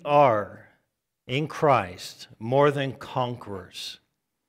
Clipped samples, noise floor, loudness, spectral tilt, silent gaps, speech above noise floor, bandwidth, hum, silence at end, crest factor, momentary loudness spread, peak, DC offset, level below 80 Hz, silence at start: under 0.1%; -77 dBFS; -25 LUFS; -6 dB/octave; none; 53 dB; 15.5 kHz; none; 0.55 s; 18 dB; 17 LU; -6 dBFS; under 0.1%; -66 dBFS; 0.05 s